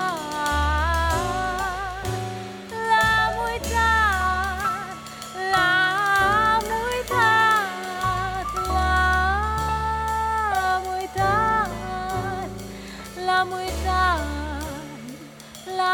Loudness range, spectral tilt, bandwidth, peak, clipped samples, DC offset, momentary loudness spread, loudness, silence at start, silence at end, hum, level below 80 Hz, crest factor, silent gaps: 5 LU; -4 dB/octave; 19.5 kHz; -6 dBFS; under 0.1%; under 0.1%; 15 LU; -22 LUFS; 0 s; 0 s; none; -34 dBFS; 16 dB; none